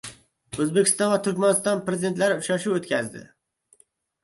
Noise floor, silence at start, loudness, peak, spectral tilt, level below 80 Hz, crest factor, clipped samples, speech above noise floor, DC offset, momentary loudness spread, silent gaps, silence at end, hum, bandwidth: -62 dBFS; 0.05 s; -23 LUFS; -6 dBFS; -4 dB/octave; -64 dBFS; 18 dB; under 0.1%; 39 dB; under 0.1%; 15 LU; none; 1 s; none; 12 kHz